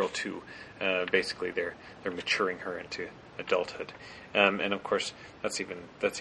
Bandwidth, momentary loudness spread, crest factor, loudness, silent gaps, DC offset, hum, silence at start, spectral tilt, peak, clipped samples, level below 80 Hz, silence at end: 10.5 kHz; 16 LU; 24 dB; -31 LUFS; none; under 0.1%; none; 0 s; -3 dB/octave; -10 dBFS; under 0.1%; -66 dBFS; 0 s